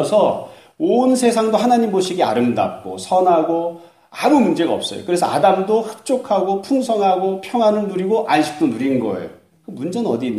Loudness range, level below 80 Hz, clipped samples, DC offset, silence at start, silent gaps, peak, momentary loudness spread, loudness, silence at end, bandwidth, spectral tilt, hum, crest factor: 2 LU; -62 dBFS; under 0.1%; under 0.1%; 0 s; none; -2 dBFS; 10 LU; -17 LUFS; 0 s; 15 kHz; -5.5 dB/octave; none; 16 dB